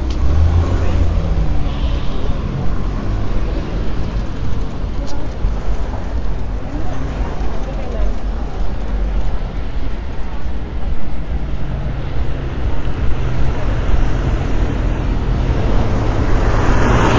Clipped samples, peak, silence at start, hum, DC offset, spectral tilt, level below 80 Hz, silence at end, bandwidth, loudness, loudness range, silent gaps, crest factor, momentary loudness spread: under 0.1%; -2 dBFS; 0 s; none; under 0.1%; -7 dB/octave; -18 dBFS; 0 s; 7.6 kHz; -21 LUFS; 6 LU; none; 12 dB; 9 LU